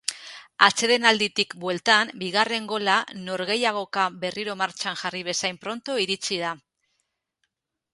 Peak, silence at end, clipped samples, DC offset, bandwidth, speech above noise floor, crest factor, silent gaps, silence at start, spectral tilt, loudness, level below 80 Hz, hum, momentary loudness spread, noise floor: 0 dBFS; 1.35 s; under 0.1%; under 0.1%; 11.5 kHz; 53 dB; 26 dB; none; 0.1 s; -2 dB/octave; -23 LUFS; -72 dBFS; none; 12 LU; -77 dBFS